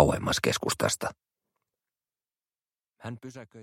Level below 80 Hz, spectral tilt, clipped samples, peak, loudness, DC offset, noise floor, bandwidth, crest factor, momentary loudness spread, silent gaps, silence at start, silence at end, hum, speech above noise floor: -50 dBFS; -4 dB/octave; under 0.1%; -4 dBFS; -28 LUFS; under 0.1%; under -90 dBFS; 16 kHz; 28 dB; 17 LU; none; 0 s; 0 s; none; over 60 dB